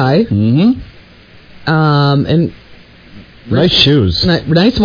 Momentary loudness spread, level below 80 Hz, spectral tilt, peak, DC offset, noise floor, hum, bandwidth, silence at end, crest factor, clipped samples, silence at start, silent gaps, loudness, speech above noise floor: 9 LU; -34 dBFS; -7.5 dB/octave; 0 dBFS; under 0.1%; -40 dBFS; none; 5.4 kHz; 0 s; 12 dB; under 0.1%; 0 s; none; -11 LUFS; 29 dB